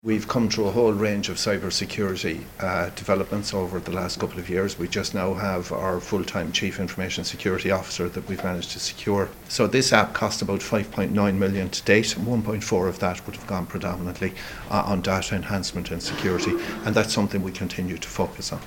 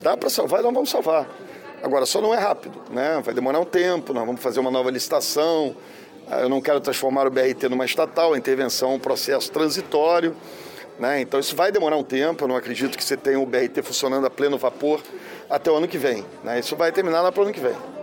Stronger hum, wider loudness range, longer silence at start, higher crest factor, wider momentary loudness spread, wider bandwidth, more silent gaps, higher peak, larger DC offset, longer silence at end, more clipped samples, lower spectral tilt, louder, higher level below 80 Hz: neither; about the same, 4 LU vs 2 LU; about the same, 0.05 s vs 0 s; first, 24 dB vs 14 dB; about the same, 8 LU vs 8 LU; about the same, 17 kHz vs 17 kHz; neither; first, 0 dBFS vs -8 dBFS; neither; about the same, 0 s vs 0 s; neither; about the same, -4.5 dB/octave vs -3.5 dB/octave; second, -25 LUFS vs -22 LUFS; first, -48 dBFS vs -70 dBFS